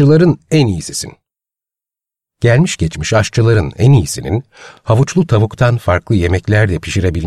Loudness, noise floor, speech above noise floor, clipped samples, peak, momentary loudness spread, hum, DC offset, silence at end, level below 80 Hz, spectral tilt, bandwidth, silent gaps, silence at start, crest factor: -13 LUFS; -87 dBFS; 75 dB; under 0.1%; 0 dBFS; 9 LU; none; 0.3%; 0 s; -34 dBFS; -6 dB/octave; 13 kHz; none; 0 s; 12 dB